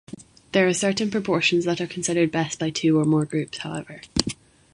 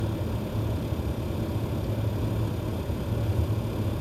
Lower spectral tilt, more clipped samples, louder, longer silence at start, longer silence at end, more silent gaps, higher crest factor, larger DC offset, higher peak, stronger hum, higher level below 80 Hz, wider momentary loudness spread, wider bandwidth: second, -4.5 dB/octave vs -7.5 dB/octave; neither; first, -23 LUFS vs -29 LUFS; first, 0.15 s vs 0 s; first, 0.4 s vs 0 s; neither; first, 24 dB vs 14 dB; neither; first, 0 dBFS vs -14 dBFS; neither; second, -50 dBFS vs -36 dBFS; first, 13 LU vs 3 LU; second, 11.5 kHz vs 15 kHz